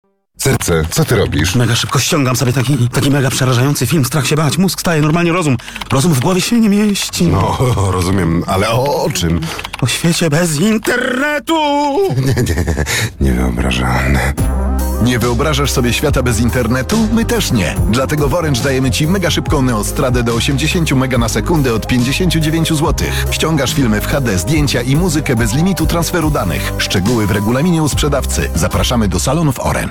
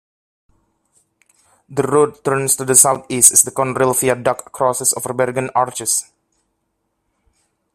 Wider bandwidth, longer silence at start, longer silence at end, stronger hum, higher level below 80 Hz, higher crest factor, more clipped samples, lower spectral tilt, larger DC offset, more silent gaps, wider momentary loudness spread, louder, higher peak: first, 18 kHz vs 16 kHz; second, 0.4 s vs 1.7 s; second, 0 s vs 1.7 s; neither; first, -24 dBFS vs -58 dBFS; second, 10 dB vs 18 dB; neither; first, -5 dB/octave vs -3 dB/octave; neither; neither; second, 3 LU vs 10 LU; about the same, -14 LUFS vs -15 LUFS; about the same, -2 dBFS vs 0 dBFS